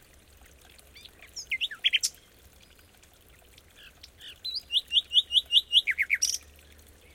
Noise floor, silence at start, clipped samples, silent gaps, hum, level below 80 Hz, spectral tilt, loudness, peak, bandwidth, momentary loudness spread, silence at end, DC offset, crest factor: -57 dBFS; 0.95 s; under 0.1%; none; none; -60 dBFS; 2.5 dB/octave; -25 LUFS; -8 dBFS; 17 kHz; 19 LU; 0.75 s; under 0.1%; 22 dB